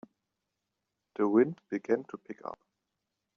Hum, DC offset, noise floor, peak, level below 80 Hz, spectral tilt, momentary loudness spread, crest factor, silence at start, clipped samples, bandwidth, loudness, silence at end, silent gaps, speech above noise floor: none; under 0.1%; -85 dBFS; -12 dBFS; -82 dBFS; -8 dB/octave; 19 LU; 22 dB; 1.2 s; under 0.1%; 6.6 kHz; -30 LUFS; 0.85 s; none; 55 dB